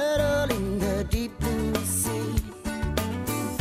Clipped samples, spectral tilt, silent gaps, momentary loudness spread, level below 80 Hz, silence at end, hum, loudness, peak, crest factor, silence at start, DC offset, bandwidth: under 0.1%; -5 dB/octave; none; 6 LU; -36 dBFS; 0 s; none; -27 LUFS; -10 dBFS; 16 dB; 0 s; under 0.1%; 15.5 kHz